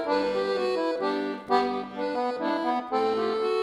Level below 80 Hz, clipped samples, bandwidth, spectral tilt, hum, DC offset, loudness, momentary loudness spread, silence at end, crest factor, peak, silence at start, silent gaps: -64 dBFS; under 0.1%; 11.5 kHz; -5 dB/octave; none; under 0.1%; -27 LUFS; 4 LU; 0 s; 16 dB; -10 dBFS; 0 s; none